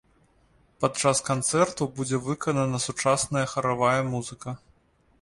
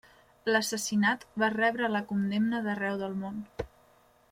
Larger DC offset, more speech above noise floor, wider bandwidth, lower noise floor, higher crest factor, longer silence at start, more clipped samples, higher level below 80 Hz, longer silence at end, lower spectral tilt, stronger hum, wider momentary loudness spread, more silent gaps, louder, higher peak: neither; first, 37 dB vs 33 dB; second, 11.5 kHz vs 16 kHz; about the same, -63 dBFS vs -63 dBFS; about the same, 20 dB vs 18 dB; first, 0.8 s vs 0.45 s; neither; about the same, -58 dBFS vs -60 dBFS; about the same, 0.65 s vs 0.65 s; about the same, -4.5 dB/octave vs -4.5 dB/octave; neither; about the same, 10 LU vs 12 LU; neither; first, -25 LUFS vs -30 LUFS; first, -8 dBFS vs -12 dBFS